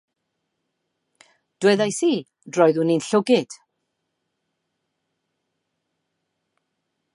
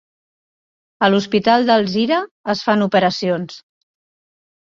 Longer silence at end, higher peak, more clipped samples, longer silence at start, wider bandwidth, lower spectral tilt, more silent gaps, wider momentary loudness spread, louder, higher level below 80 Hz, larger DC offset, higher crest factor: first, 3.6 s vs 1.1 s; about the same, -2 dBFS vs -2 dBFS; neither; first, 1.6 s vs 1 s; first, 11.5 kHz vs 7.6 kHz; about the same, -5 dB/octave vs -5.5 dB/octave; second, none vs 2.31-2.44 s; about the same, 9 LU vs 8 LU; second, -20 LUFS vs -17 LUFS; second, -78 dBFS vs -60 dBFS; neither; about the same, 22 dB vs 18 dB